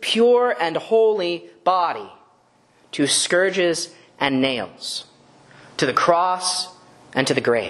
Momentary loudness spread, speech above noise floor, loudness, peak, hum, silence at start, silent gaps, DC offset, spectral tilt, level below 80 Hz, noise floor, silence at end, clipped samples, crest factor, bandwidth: 12 LU; 38 dB; -20 LUFS; 0 dBFS; none; 0 s; none; under 0.1%; -3 dB/octave; -66 dBFS; -58 dBFS; 0 s; under 0.1%; 22 dB; 12 kHz